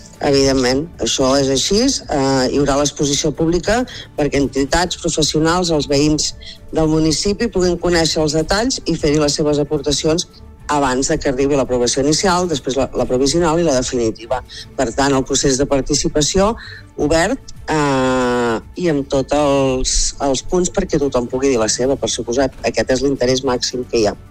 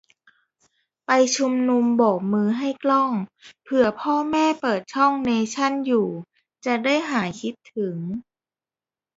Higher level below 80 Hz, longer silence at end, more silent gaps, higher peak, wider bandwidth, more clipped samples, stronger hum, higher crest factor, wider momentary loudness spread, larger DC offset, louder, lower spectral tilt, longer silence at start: first, -32 dBFS vs -66 dBFS; second, 0.05 s vs 0.95 s; neither; about the same, -2 dBFS vs -4 dBFS; first, 15.5 kHz vs 8 kHz; neither; neither; about the same, 14 dB vs 18 dB; second, 5 LU vs 12 LU; neither; first, -16 LUFS vs -22 LUFS; about the same, -4 dB/octave vs -4.5 dB/octave; second, 0 s vs 1.1 s